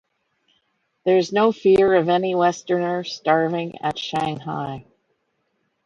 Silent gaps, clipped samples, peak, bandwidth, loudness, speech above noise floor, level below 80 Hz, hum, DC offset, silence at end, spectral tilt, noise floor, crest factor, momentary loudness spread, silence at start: none; under 0.1%; -4 dBFS; 7.8 kHz; -20 LUFS; 51 dB; -60 dBFS; none; under 0.1%; 1.05 s; -6 dB/octave; -71 dBFS; 18 dB; 12 LU; 1.05 s